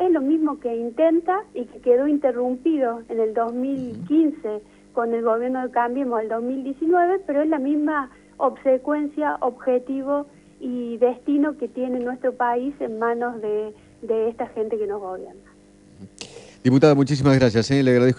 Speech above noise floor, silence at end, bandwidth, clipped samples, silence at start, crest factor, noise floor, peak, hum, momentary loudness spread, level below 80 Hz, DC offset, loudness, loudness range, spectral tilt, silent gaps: 29 dB; 0 s; 10.5 kHz; under 0.1%; 0 s; 20 dB; -50 dBFS; -2 dBFS; 50 Hz at -55 dBFS; 13 LU; -56 dBFS; under 0.1%; -22 LUFS; 4 LU; -7.5 dB/octave; none